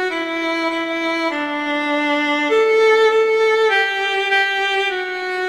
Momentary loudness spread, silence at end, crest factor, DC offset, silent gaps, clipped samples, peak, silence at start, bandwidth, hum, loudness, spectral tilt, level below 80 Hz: 7 LU; 0 s; 12 dB; 0.1%; none; under 0.1%; -6 dBFS; 0 s; 12 kHz; none; -17 LUFS; -2 dB/octave; -64 dBFS